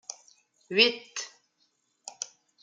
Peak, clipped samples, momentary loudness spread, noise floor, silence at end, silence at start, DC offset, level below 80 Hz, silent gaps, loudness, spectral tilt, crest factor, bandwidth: -6 dBFS; under 0.1%; 24 LU; -73 dBFS; 0.35 s; 0.1 s; under 0.1%; -88 dBFS; none; -26 LUFS; -1 dB/octave; 26 dB; 9.6 kHz